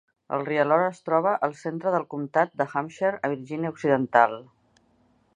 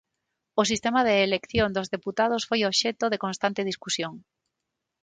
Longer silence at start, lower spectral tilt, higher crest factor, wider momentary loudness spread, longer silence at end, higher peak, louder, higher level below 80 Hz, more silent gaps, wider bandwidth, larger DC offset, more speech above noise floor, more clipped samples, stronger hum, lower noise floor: second, 0.3 s vs 0.55 s; first, -7 dB/octave vs -3.5 dB/octave; about the same, 22 dB vs 18 dB; about the same, 9 LU vs 8 LU; about the same, 0.9 s vs 0.85 s; first, -4 dBFS vs -8 dBFS; about the same, -25 LUFS vs -25 LUFS; second, -74 dBFS vs -54 dBFS; neither; about the same, 10 kHz vs 9.6 kHz; neither; second, 40 dB vs 58 dB; neither; neither; second, -64 dBFS vs -83 dBFS